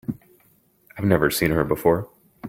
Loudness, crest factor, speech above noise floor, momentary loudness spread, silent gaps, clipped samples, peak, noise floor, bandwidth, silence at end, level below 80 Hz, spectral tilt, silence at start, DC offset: -21 LUFS; 22 dB; 40 dB; 17 LU; none; under 0.1%; -2 dBFS; -60 dBFS; 17 kHz; 0 s; -46 dBFS; -5.5 dB/octave; 0.1 s; under 0.1%